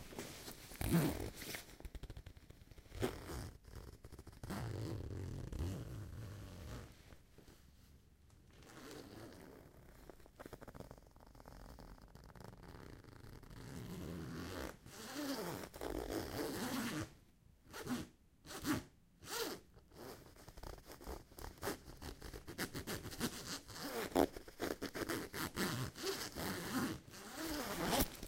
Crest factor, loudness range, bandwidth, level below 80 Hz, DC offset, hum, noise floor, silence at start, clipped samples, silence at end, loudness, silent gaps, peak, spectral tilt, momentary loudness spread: 30 dB; 16 LU; 16.5 kHz; -58 dBFS; under 0.1%; none; -67 dBFS; 0 s; under 0.1%; 0 s; -45 LUFS; none; -16 dBFS; -4.5 dB/octave; 19 LU